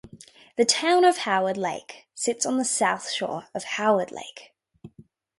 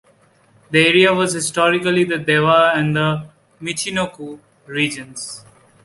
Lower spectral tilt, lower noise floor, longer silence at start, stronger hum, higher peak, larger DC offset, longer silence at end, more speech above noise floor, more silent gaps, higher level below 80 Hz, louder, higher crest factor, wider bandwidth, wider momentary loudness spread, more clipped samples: second, -2.5 dB/octave vs -4 dB/octave; about the same, -54 dBFS vs -54 dBFS; second, 0.05 s vs 0.7 s; neither; about the same, -4 dBFS vs -2 dBFS; neither; about the same, 0.5 s vs 0.45 s; second, 30 dB vs 37 dB; neither; second, -70 dBFS vs -56 dBFS; second, -24 LUFS vs -16 LUFS; about the same, 20 dB vs 16 dB; about the same, 11.5 kHz vs 11.5 kHz; about the same, 16 LU vs 17 LU; neither